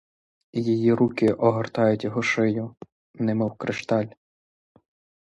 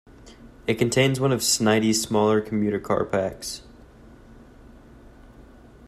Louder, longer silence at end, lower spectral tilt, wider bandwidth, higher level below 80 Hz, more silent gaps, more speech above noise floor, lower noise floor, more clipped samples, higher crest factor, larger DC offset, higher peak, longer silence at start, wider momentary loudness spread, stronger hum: about the same, -24 LUFS vs -22 LUFS; first, 1.15 s vs 0 s; first, -7 dB/octave vs -4.5 dB/octave; second, 10.5 kHz vs 16 kHz; second, -62 dBFS vs -52 dBFS; first, 2.92-3.14 s vs none; first, over 67 dB vs 26 dB; first, under -90 dBFS vs -48 dBFS; neither; about the same, 18 dB vs 20 dB; neither; about the same, -6 dBFS vs -6 dBFS; first, 0.55 s vs 0.25 s; second, 10 LU vs 13 LU; neither